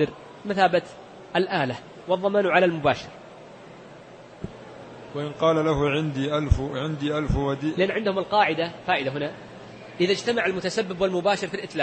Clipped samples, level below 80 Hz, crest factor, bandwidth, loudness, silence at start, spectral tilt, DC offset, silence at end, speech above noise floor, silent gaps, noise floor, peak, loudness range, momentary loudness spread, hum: under 0.1%; -42 dBFS; 20 dB; 8.8 kHz; -24 LUFS; 0 s; -6 dB/octave; under 0.1%; 0 s; 21 dB; none; -45 dBFS; -4 dBFS; 3 LU; 21 LU; none